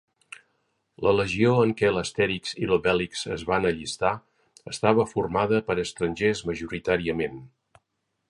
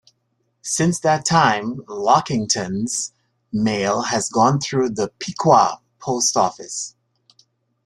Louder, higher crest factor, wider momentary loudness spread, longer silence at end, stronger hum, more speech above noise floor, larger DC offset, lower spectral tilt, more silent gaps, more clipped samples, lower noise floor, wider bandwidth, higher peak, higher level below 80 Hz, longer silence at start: second, -25 LUFS vs -19 LUFS; about the same, 22 dB vs 20 dB; about the same, 12 LU vs 13 LU; about the same, 0.85 s vs 0.95 s; neither; about the same, 53 dB vs 51 dB; neither; first, -5.5 dB/octave vs -4 dB/octave; neither; neither; first, -78 dBFS vs -70 dBFS; second, 11.5 kHz vs 13 kHz; second, -4 dBFS vs 0 dBFS; first, -52 dBFS vs -58 dBFS; first, 1 s vs 0.65 s